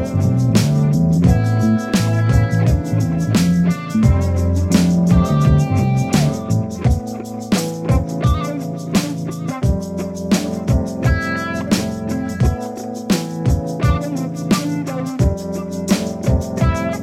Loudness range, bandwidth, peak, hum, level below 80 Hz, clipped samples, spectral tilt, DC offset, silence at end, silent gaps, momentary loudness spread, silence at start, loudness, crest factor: 4 LU; 16 kHz; 0 dBFS; none; -28 dBFS; under 0.1%; -6.5 dB/octave; under 0.1%; 0 s; none; 9 LU; 0 s; -18 LUFS; 16 dB